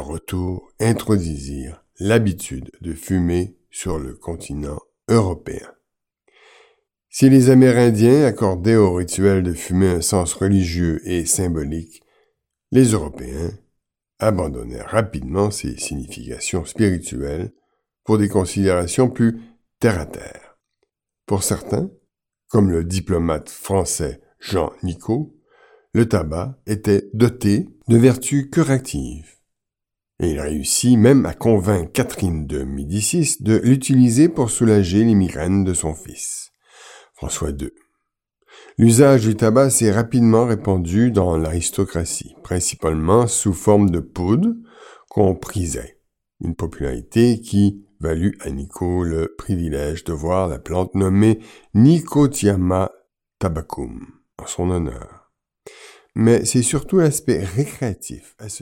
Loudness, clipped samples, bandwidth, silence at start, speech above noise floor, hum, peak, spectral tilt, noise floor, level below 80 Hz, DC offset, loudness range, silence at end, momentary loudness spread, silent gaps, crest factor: -18 LUFS; under 0.1%; 17 kHz; 0 s; 67 dB; none; 0 dBFS; -6 dB/octave; -84 dBFS; -38 dBFS; under 0.1%; 8 LU; 0.05 s; 16 LU; none; 18 dB